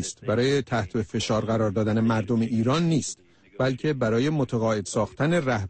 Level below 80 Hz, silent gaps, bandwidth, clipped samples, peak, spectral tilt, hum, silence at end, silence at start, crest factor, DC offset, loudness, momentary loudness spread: -52 dBFS; none; 8.8 kHz; under 0.1%; -14 dBFS; -6 dB/octave; none; 0 s; 0 s; 12 dB; under 0.1%; -25 LUFS; 5 LU